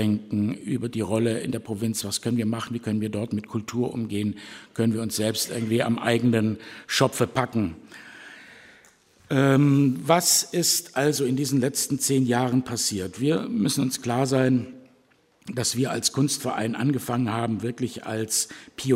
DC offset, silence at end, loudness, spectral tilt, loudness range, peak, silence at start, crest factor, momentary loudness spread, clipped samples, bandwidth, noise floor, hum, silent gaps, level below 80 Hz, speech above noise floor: under 0.1%; 0 s; -24 LUFS; -4.5 dB/octave; 6 LU; -4 dBFS; 0 s; 22 dB; 10 LU; under 0.1%; 16 kHz; -61 dBFS; none; none; -62 dBFS; 37 dB